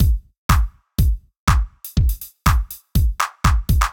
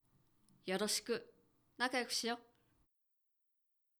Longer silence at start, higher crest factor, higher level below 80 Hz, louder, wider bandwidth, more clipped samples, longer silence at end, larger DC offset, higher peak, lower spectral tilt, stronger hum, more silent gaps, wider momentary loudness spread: second, 0 s vs 0.65 s; second, 16 dB vs 24 dB; first, -20 dBFS vs -84 dBFS; first, -21 LUFS vs -39 LUFS; about the same, 19.5 kHz vs over 20 kHz; neither; second, 0 s vs 1.6 s; neither; first, -2 dBFS vs -20 dBFS; first, -5 dB/octave vs -2 dB/octave; neither; first, 0.38-0.49 s, 1.39-1.47 s vs none; second, 5 LU vs 8 LU